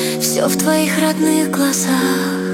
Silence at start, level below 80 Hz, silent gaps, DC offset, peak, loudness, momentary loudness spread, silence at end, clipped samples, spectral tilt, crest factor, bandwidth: 0 s; -58 dBFS; none; under 0.1%; -2 dBFS; -15 LUFS; 2 LU; 0 s; under 0.1%; -4 dB/octave; 12 dB; 16.5 kHz